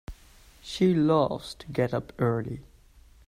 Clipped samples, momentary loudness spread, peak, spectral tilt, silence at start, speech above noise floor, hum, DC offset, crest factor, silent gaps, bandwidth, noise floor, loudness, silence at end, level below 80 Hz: under 0.1%; 18 LU; -10 dBFS; -7 dB/octave; 0.1 s; 29 dB; none; under 0.1%; 18 dB; none; 14 kHz; -55 dBFS; -27 LUFS; 0.65 s; -52 dBFS